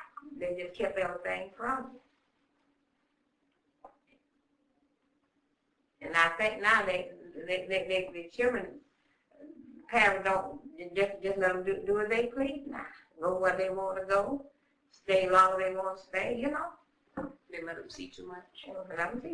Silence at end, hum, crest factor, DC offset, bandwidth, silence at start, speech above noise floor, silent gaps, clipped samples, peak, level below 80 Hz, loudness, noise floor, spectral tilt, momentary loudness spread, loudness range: 0 s; none; 24 dB; under 0.1%; 10.5 kHz; 0 s; 45 dB; none; under 0.1%; -10 dBFS; -64 dBFS; -31 LUFS; -77 dBFS; -4 dB/octave; 20 LU; 9 LU